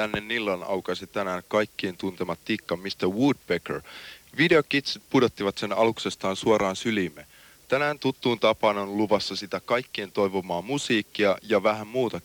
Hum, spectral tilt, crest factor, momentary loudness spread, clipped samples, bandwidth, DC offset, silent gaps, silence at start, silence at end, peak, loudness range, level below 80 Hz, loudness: none; -5 dB/octave; 18 dB; 9 LU; under 0.1%; 19.5 kHz; under 0.1%; none; 0 s; 0.05 s; -8 dBFS; 4 LU; -60 dBFS; -26 LUFS